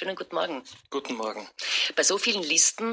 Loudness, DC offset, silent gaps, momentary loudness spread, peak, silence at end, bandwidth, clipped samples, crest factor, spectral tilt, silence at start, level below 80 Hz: -25 LUFS; under 0.1%; none; 14 LU; -8 dBFS; 0 s; 8 kHz; under 0.1%; 20 dB; 0 dB/octave; 0 s; -76 dBFS